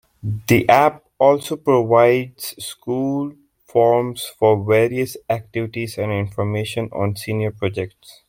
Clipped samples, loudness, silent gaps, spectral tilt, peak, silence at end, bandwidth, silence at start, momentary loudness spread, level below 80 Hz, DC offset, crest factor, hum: under 0.1%; -19 LUFS; none; -6 dB/octave; -2 dBFS; 0.15 s; 16.5 kHz; 0.25 s; 13 LU; -54 dBFS; under 0.1%; 18 dB; none